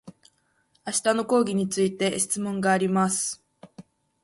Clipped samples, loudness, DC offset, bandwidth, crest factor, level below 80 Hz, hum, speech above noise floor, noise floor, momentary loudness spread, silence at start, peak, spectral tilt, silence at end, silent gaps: under 0.1%; -24 LUFS; under 0.1%; 12 kHz; 18 dB; -66 dBFS; none; 44 dB; -68 dBFS; 7 LU; 0.05 s; -10 dBFS; -4 dB/octave; 0.4 s; none